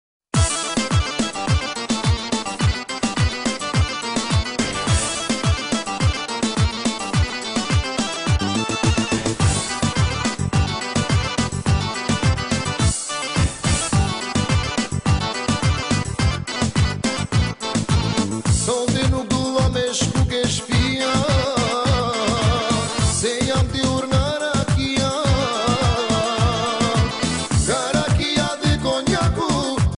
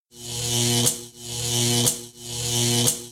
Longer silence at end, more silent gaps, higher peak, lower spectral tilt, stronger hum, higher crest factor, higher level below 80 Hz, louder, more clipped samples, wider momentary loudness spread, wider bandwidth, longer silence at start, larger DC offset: about the same, 0 s vs 0 s; neither; about the same, -6 dBFS vs -6 dBFS; first, -4.5 dB/octave vs -2.5 dB/octave; neither; second, 12 dB vs 18 dB; first, -30 dBFS vs -52 dBFS; about the same, -20 LUFS vs -22 LUFS; neither; second, 3 LU vs 13 LU; second, 11 kHz vs 16.5 kHz; first, 0.35 s vs 0.15 s; neither